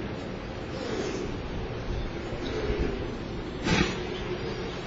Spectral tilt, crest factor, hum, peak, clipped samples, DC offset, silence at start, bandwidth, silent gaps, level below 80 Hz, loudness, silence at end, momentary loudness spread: -5.5 dB/octave; 22 dB; none; -10 dBFS; under 0.1%; under 0.1%; 0 s; 8 kHz; none; -38 dBFS; -32 LUFS; 0 s; 9 LU